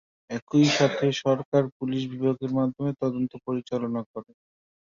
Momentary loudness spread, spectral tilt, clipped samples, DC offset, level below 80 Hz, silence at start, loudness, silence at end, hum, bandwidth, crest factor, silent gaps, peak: 12 LU; -6 dB/octave; under 0.1%; under 0.1%; -66 dBFS; 0.3 s; -26 LUFS; 0.65 s; none; 7.6 kHz; 18 dB; 0.42-0.47 s, 1.45-1.52 s, 1.72-1.80 s, 4.06-4.14 s; -8 dBFS